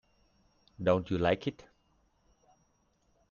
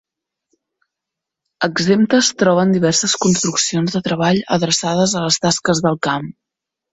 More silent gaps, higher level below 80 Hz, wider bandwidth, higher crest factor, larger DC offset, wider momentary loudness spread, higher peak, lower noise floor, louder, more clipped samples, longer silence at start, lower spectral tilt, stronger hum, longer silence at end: neither; second, -62 dBFS vs -54 dBFS; second, 7 kHz vs 8.2 kHz; first, 22 dB vs 16 dB; neither; about the same, 6 LU vs 6 LU; second, -14 dBFS vs -2 dBFS; second, -72 dBFS vs -83 dBFS; second, -31 LUFS vs -16 LUFS; neither; second, 0.8 s vs 1.6 s; first, -7.5 dB/octave vs -4 dB/octave; neither; first, 1.8 s vs 0.6 s